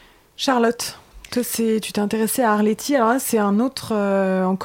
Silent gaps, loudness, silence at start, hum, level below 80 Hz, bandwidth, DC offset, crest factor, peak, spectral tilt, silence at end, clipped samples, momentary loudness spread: none; -20 LUFS; 0.4 s; none; -56 dBFS; 17 kHz; under 0.1%; 14 dB; -6 dBFS; -4.5 dB/octave; 0 s; under 0.1%; 7 LU